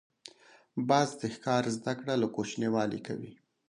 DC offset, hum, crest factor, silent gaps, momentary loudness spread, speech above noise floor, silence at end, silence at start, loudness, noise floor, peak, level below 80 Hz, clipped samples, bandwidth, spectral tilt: under 0.1%; none; 20 dB; none; 21 LU; 28 dB; 0.35 s; 0.75 s; -32 LUFS; -59 dBFS; -12 dBFS; -72 dBFS; under 0.1%; 11 kHz; -5.5 dB/octave